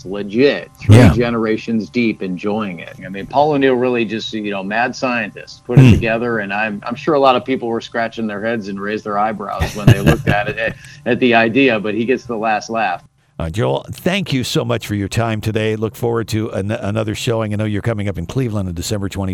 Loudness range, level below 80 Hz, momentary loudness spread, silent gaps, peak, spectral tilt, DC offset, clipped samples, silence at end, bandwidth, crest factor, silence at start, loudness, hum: 4 LU; -36 dBFS; 10 LU; none; 0 dBFS; -6.5 dB/octave; under 0.1%; 0.3%; 0 s; 15.5 kHz; 16 dB; 0.05 s; -17 LUFS; none